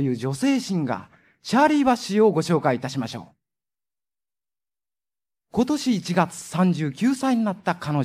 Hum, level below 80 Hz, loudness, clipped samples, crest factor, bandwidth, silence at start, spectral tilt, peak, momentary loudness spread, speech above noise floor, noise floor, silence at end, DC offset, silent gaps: none; -62 dBFS; -22 LUFS; under 0.1%; 18 dB; 15.5 kHz; 0 s; -6 dB/octave; -6 dBFS; 10 LU; over 68 dB; under -90 dBFS; 0 s; under 0.1%; none